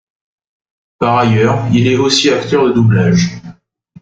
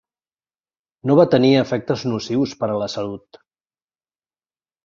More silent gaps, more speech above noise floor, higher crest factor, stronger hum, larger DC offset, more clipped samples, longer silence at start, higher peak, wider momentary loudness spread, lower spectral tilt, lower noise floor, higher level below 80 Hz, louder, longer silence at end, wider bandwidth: neither; second, 32 dB vs over 72 dB; second, 14 dB vs 20 dB; neither; neither; neither; about the same, 1 s vs 1.05 s; about the same, 0 dBFS vs -2 dBFS; second, 6 LU vs 14 LU; about the same, -5.5 dB/octave vs -6.5 dB/octave; second, -43 dBFS vs under -90 dBFS; first, -44 dBFS vs -58 dBFS; first, -12 LUFS vs -19 LUFS; second, 0.5 s vs 1.7 s; first, 9 kHz vs 7.4 kHz